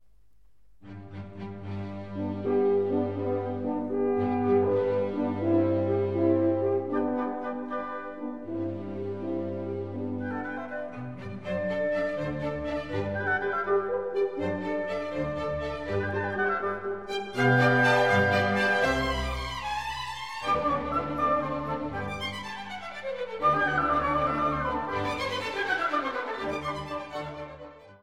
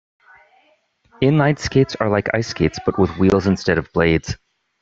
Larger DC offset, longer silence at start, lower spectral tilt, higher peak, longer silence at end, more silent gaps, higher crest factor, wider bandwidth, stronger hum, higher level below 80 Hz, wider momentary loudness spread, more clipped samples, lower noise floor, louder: first, 0.3% vs under 0.1%; second, 0.85 s vs 1.2 s; about the same, -6.5 dB/octave vs -6.5 dB/octave; second, -10 dBFS vs -2 dBFS; second, 0 s vs 0.45 s; neither; about the same, 18 dB vs 16 dB; first, 13.5 kHz vs 7.8 kHz; neither; second, -50 dBFS vs -42 dBFS; first, 13 LU vs 5 LU; neither; first, -64 dBFS vs -60 dBFS; second, -28 LUFS vs -18 LUFS